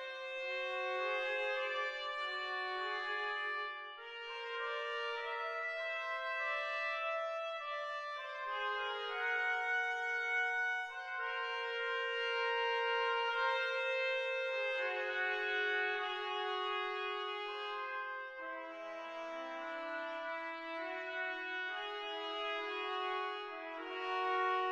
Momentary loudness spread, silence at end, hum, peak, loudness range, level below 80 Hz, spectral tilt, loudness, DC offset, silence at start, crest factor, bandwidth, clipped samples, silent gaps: 9 LU; 0 s; none; -24 dBFS; 6 LU; -82 dBFS; -0.5 dB/octave; -38 LUFS; under 0.1%; 0 s; 14 dB; 10 kHz; under 0.1%; none